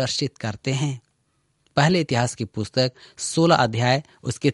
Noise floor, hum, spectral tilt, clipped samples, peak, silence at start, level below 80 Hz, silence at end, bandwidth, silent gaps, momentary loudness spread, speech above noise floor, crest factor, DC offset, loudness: -69 dBFS; none; -5 dB/octave; under 0.1%; -2 dBFS; 0 s; -56 dBFS; 0 s; 11.5 kHz; none; 11 LU; 47 dB; 20 dB; under 0.1%; -22 LUFS